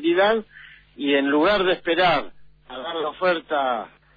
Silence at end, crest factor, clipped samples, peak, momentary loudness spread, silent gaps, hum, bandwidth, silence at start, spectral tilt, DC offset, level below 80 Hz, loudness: 0.3 s; 16 dB; under 0.1%; -8 dBFS; 12 LU; none; none; 5 kHz; 0 s; -6.5 dB/octave; under 0.1%; -54 dBFS; -21 LUFS